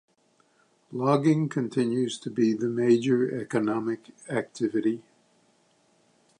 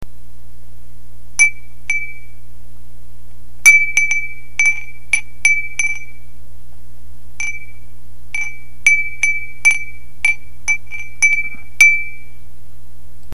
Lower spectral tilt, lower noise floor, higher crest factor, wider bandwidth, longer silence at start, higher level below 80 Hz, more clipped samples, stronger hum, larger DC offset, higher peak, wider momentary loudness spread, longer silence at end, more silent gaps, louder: first, -7 dB/octave vs 0.5 dB/octave; first, -66 dBFS vs -43 dBFS; about the same, 18 dB vs 20 dB; second, 11 kHz vs 15.5 kHz; second, 0.9 s vs 1.4 s; second, -74 dBFS vs -42 dBFS; neither; second, none vs 60 Hz at -40 dBFS; second, under 0.1% vs 10%; second, -10 dBFS vs 0 dBFS; second, 10 LU vs 17 LU; first, 1.4 s vs 1.15 s; neither; second, -26 LUFS vs -14 LUFS